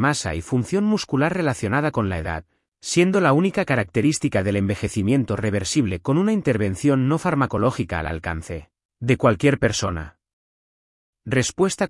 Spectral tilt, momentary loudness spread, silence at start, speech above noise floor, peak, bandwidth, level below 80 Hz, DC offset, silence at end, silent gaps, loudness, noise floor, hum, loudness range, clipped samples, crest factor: -5.5 dB/octave; 10 LU; 0 s; over 69 dB; -4 dBFS; 12 kHz; -46 dBFS; under 0.1%; 0 s; 8.85-8.89 s, 10.33-11.13 s; -21 LUFS; under -90 dBFS; none; 3 LU; under 0.1%; 16 dB